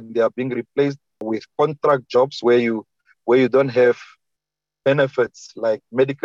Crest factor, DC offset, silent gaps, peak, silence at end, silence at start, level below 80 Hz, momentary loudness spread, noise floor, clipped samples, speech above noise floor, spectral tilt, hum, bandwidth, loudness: 14 dB; under 0.1%; none; -6 dBFS; 0.1 s; 0 s; -66 dBFS; 11 LU; -85 dBFS; under 0.1%; 67 dB; -6.5 dB/octave; none; 7.6 kHz; -20 LUFS